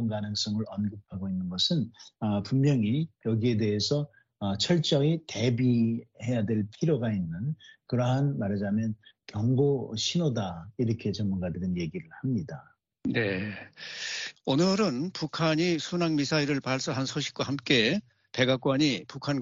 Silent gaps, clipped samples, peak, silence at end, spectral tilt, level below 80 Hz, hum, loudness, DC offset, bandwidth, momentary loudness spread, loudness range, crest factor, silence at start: none; under 0.1%; -8 dBFS; 0 s; -5 dB/octave; -62 dBFS; none; -28 LUFS; under 0.1%; 7.6 kHz; 10 LU; 4 LU; 20 dB; 0 s